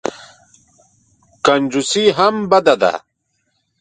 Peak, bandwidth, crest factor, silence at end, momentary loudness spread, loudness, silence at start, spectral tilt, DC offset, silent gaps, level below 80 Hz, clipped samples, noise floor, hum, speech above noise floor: 0 dBFS; 9.4 kHz; 18 dB; 0.8 s; 6 LU; -15 LUFS; 0.05 s; -3.5 dB/octave; under 0.1%; none; -58 dBFS; under 0.1%; -68 dBFS; none; 54 dB